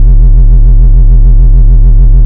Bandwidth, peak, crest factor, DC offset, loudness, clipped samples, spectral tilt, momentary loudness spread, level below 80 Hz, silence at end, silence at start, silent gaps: 1 kHz; 0 dBFS; 2 dB; under 0.1%; -7 LUFS; 20%; -12.5 dB/octave; 0 LU; -2 dBFS; 0 s; 0 s; none